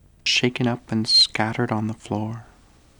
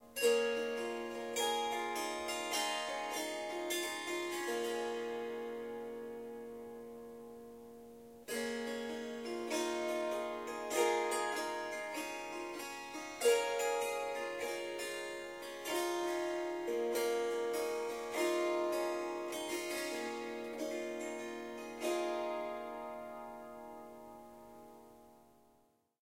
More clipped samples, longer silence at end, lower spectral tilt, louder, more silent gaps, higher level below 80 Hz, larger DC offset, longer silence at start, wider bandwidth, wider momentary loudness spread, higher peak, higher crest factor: neither; second, 0.55 s vs 0.8 s; first, -4 dB/octave vs -1.5 dB/octave; first, -20 LUFS vs -38 LUFS; neither; first, -56 dBFS vs -76 dBFS; neither; first, 0.25 s vs 0 s; first, over 20 kHz vs 16 kHz; second, 13 LU vs 16 LU; first, -4 dBFS vs -18 dBFS; about the same, 20 dB vs 20 dB